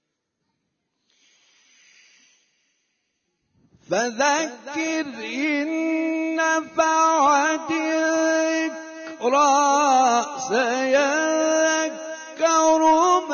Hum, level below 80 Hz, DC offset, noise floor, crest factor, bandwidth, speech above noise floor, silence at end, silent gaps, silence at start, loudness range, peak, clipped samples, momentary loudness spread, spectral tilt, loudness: none; -68 dBFS; under 0.1%; -77 dBFS; 14 dB; 7 kHz; 57 dB; 0 s; none; 3.9 s; 8 LU; -8 dBFS; under 0.1%; 10 LU; -2 dB/octave; -20 LUFS